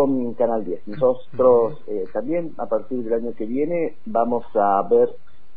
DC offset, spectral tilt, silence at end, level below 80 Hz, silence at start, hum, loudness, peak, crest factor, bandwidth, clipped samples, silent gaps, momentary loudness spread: 4%; -12 dB/octave; 0.4 s; -60 dBFS; 0 s; none; -22 LUFS; -6 dBFS; 16 dB; 4.5 kHz; under 0.1%; none; 9 LU